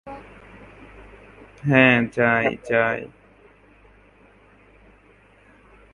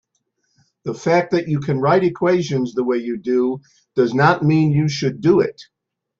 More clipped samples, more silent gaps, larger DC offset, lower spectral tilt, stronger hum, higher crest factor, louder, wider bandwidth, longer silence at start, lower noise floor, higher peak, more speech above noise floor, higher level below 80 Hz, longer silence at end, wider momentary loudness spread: neither; neither; neither; about the same, -7.5 dB/octave vs -7 dB/octave; neither; first, 24 dB vs 16 dB; about the same, -19 LUFS vs -18 LUFS; first, 10.5 kHz vs 7.6 kHz; second, 0.05 s vs 0.85 s; second, -54 dBFS vs -70 dBFS; about the same, -2 dBFS vs -2 dBFS; second, 34 dB vs 52 dB; about the same, -54 dBFS vs -56 dBFS; first, 2.85 s vs 0.55 s; first, 25 LU vs 9 LU